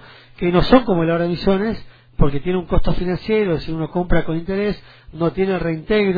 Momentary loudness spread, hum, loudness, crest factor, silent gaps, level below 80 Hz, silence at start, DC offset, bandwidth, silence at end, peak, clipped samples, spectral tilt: 9 LU; none; -19 LUFS; 18 dB; none; -28 dBFS; 0.4 s; under 0.1%; 5 kHz; 0 s; 0 dBFS; under 0.1%; -9.5 dB/octave